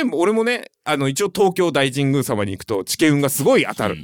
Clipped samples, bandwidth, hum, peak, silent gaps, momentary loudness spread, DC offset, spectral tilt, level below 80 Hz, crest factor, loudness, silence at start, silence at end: under 0.1%; 19.5 kHz; none; -4 dBFS; none; 7 LU; under 0.1%; -4.5 dB/octave; -58 dBFS; 14 dB; -19 LUFS; 0 s; 0 s